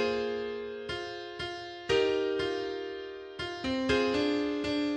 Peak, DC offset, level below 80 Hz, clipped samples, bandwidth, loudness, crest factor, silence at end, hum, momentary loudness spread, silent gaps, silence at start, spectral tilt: -16 dBFS; under 0.1%; -56 dBFS; under 0.1%; 9.8 kHz; -32 LUFS; 16 dB; 0 s; none; 11 LU; none; 0 s; -5 dB/octave